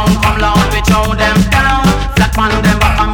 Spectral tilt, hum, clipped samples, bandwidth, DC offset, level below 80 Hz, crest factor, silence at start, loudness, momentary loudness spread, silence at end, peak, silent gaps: -5 dB/octave; none; under 0.1%; 19.5 kHz; under 0.1%; -16 dBFS; 8 dB; 0 s; -11 LUFS; 2 LU; 0 s; -2 dBFS; none